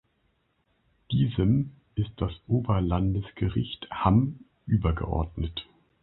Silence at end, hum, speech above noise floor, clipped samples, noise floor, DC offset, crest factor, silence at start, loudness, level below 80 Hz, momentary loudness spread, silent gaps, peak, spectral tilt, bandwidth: 0.4 s; none; 45 dB; under 0.1%; -71 dBFS; under 0.1%; 22 dB; 1.1 s; -28 LUFS; -38 dBFS; 10 LU; none; -6 dBFS; -12 dB/octave; 4.1 kHz